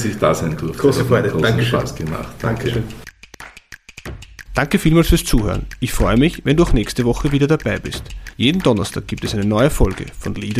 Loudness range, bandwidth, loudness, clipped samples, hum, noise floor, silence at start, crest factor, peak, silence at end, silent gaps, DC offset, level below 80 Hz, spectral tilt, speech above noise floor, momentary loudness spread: 5 LU; 15.5 kHz; -18 LUFS; under 0.1%; none; -41 dBFS; 0 s; 16 dB; -2 dBFS; 0 s; none; 0.2%; -26 dBFS; -6 dB/octave; 24 dB; 19 LU